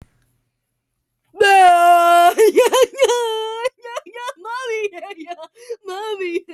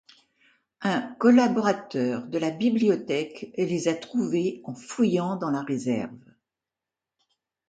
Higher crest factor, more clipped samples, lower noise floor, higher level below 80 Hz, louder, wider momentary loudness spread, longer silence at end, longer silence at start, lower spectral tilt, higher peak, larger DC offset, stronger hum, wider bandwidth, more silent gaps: second, 14 dB vs 20 dB; neither; second, -74 dBFS vs -89 dBFS; first, -64 dBFS vs -72 dBFS; first, -14 LUFS vs -25 LUFS; first, 23 LU vs 11 LU; second, 0 s vs 1.5 s; first, 1.35 s vs 0.8 s; second, -1 dB/octave vs -6 dB/octave; first, -4 dBFS vs -8 dBFS; neither; neither; first, 14.5 kHz vs 9 kHz; neither